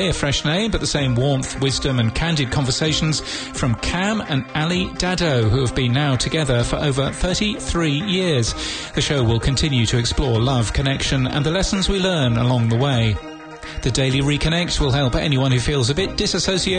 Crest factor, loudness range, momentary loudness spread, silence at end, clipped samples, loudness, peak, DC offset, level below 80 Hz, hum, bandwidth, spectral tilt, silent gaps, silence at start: 14 dB; 1 LU; 4 LU; 0 s; under 0.1%; -19 LUFS; -6 dBFS; under 0.1%; -32 dBFS; none; 9.6 kHz; -5 dB/octave; none; 0 s